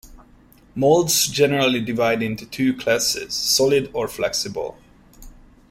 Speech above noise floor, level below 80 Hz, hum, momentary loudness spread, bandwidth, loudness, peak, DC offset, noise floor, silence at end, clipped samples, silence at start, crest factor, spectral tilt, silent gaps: 31 dB; -50 dBFS; none; 10 LU; 16.5 kHz; -20 LUFS; -4 dBFS; under 0.1%; -51 dBFS; 0.4 s; under 0.1%; 0.05 s; 18 dB; -3 dB/octave; none